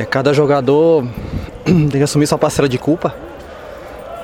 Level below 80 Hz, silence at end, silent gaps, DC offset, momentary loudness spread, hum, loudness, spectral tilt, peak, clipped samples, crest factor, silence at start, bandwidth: -38 dBFS; 0 s; none; under 0.1%; 20 LU; none; -14 LUFS; -6 dB/octave; 0 dBFS; under 0.1%; 16 dB; 0 s; 16 kHz